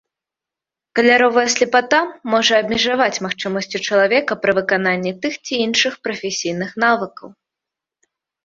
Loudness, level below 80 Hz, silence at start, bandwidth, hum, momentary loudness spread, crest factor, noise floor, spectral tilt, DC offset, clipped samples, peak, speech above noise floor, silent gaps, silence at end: -17 LUFS; -60 dBFS; 0.95 s; 7.8 kHz; none; 9 LU; 18 dB; -87 dBFS; -3 dB/octave; under 0.1%; under 0.1%; 0 dBFS; 70 dB; none; 1.15 s